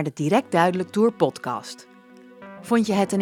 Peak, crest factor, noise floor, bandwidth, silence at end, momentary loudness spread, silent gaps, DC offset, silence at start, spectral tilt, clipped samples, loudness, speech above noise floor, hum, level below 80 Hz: -4 dBFS; 20 dB; -48 dBFS; 17.5 kHz; 0 s; 19 LU; none; under 0.1%; 0 s; -6 dB/octave; under 0.1%; -22 LUFS; 26 dB; none; -66 dBFS